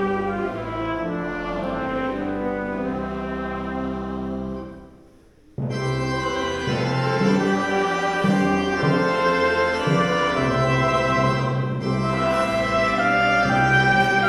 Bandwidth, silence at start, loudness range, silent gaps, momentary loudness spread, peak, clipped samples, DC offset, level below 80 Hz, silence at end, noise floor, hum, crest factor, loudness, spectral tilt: 12 kHz; 0 s; 8 LU; none; 10 LU; -6 dBFS; under 0.1%; under 0.1%; -44 dBFS; 0 s; -51 dBFS; none; 16 dB; -22 LUFS; -6 dB/octave